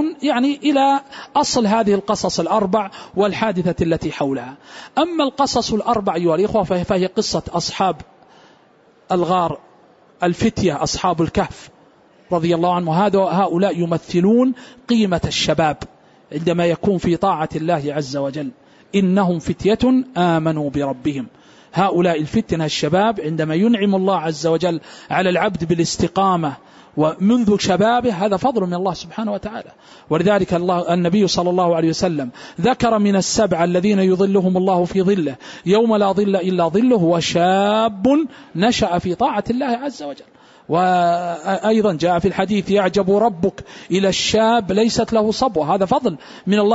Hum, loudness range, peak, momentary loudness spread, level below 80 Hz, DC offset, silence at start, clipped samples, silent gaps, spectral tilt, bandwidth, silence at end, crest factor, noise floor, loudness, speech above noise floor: none; 4 LU; -4 dBFS; 8 LU; -46 dBFS; under 0.1%; 0 s; under 0.1%; none; -5 dB/octave; 8 kHz; 0 s; 14 dB; -52 dBFS; -18 LUFS; 35 dB